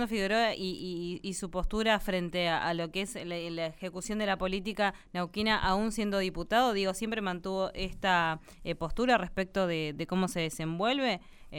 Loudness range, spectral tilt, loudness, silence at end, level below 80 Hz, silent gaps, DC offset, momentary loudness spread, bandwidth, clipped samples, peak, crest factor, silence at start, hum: 2 LU; -4.5 dB/octave; -31 LUFS; 0 s; -46 dBFS; none; under 0.1%; 9 LU; 18.5 kHz; under 0.1%; -12 dBFS; 20 dB; 0 s; none